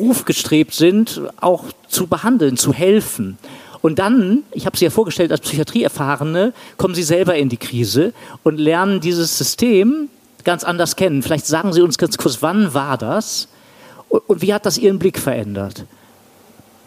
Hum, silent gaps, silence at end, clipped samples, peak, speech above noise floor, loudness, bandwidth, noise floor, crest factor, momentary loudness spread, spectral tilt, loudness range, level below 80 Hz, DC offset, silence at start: none; none; 1 s; under 0.1%; -2 dBFS; 31 dB; -16 LUFS; 15.5 kHz; -47 dBFS; 14 dB; 8 LU; -4.5 dB/octave; 2 LU; -54 dBFS; under 0.1%; 0 s